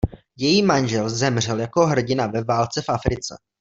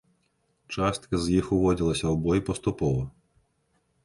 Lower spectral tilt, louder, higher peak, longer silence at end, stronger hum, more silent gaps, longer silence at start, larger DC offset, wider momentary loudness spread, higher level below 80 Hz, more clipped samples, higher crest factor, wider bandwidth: second, -5 dB/octave vs -6.5 dB/octave; first, -21 LUFS vs -26 LUFS; first, -2 dBFS vs -10 dBFS; second, 0.25 s vs 0.95 s; neither; neither; second, 0.05 s vs 0.7 s; neither; about the same, 8 LU vs 7 LU; about the same, -40 dBFS vs -44 dBFS; neither; about the same, 20 dB vs 16 dB; second, 8 kHz vs 11.5 kHz